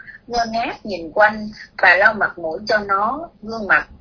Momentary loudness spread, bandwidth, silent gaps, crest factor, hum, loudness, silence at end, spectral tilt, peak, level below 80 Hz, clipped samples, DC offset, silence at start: 16 LU; 5.4 kHz; none; 18 dB; none; -17 LUFS; 0.1 s; -4 dB/octave; 0 dBFS; -48 dBFS; under 0.1%; under 0.1%; 0.05 s